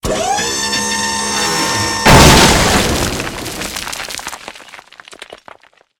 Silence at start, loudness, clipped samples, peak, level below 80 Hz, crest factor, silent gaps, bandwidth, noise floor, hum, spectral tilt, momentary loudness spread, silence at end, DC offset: 0.05 s; -12 LUFS; 0.5%; 0 dBFS; -26 dBFS; 14 dB; none; over 20 kHz; -44 dBFS; none; -3 dB/octave; 17 LU; 0.65 s; under 0.1%